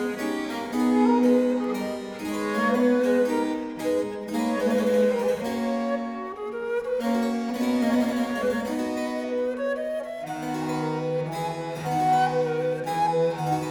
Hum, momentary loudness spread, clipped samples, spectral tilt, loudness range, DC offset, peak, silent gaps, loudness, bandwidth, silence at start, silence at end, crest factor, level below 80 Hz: none; 9 LU; under 0.1%; -6 dB/octave; 4 LU; under 0.1%; -10 dBFS; none; -25 LUFS; 18.5 kHz; 0 s; 0 s; 14 dB; -60 dBFS